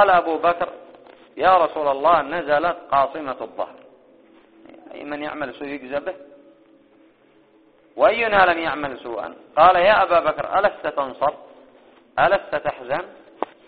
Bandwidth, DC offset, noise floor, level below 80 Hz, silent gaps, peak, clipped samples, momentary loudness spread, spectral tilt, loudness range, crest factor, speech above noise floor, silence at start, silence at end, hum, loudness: 4.8 kHz; under 0.1%; -55 dBFS; -54 dBFS; none; 0 dBFS; under 0.1%; 17 LU; -1.5 dB/octave; 15 LU; 20 dB; 36 dB; 0 s; 0.2 s; none; -20 LUFS